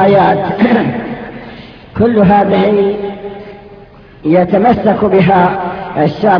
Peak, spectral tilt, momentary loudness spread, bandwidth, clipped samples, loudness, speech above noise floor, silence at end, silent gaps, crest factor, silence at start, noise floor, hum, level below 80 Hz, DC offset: 0 dBFS; -9.5 dB/octave; 19 LU; 5.4 kHz; 0.2%; -11 LUFS; 27 dB; 0 s; none; 12 dB; 0 s; -36 dBFS; none; -40 dBFS; under 0.1%